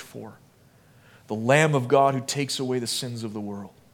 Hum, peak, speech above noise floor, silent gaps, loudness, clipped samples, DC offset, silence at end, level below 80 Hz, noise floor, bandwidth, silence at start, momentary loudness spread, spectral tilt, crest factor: none; -4 dBFS; 32 dB; none; -24 LUFS; under 0.1%; under 0.1%; 0.25 s; -70 dBFS; -56 dBFS; 17.5 kHz; 0 s; 20 LU; -4.5 dB/octave; 22 dB